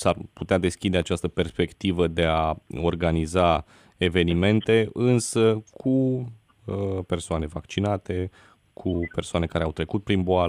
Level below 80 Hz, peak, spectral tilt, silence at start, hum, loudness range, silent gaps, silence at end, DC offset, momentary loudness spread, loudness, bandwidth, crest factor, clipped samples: -42 dBFS; -8 dBFS; -6 dB/octave; 0 s; none; 6 LU; none; 0 s; under 0.1%; 9 LU; -25 LUFS; 13 kHz; 18 dB; under 0.1%